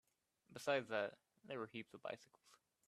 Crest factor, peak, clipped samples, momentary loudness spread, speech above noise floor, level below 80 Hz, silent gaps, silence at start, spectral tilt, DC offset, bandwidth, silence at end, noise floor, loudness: 24 dB; -24 dBFS; under 0.1%; 13 LU; 28 dB; under -90 dBFS; none; 0.5 s; -4 dB/octave; under 0.1%; 13.5 kHz; 0.65 s; -74 dBFS; -46 LUFS